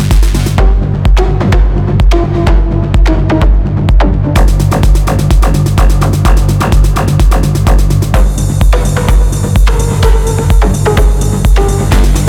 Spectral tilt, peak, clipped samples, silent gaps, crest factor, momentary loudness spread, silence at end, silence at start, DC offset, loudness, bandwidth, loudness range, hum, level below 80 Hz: -6 dB/octave; 0 dBFS; under 0.1%; none; 6 dB; 1 LU; 0 s; 0 s; under 0.1%; -10 LUFS; 15.5 kHz; 1 LU; none; -8 dBFS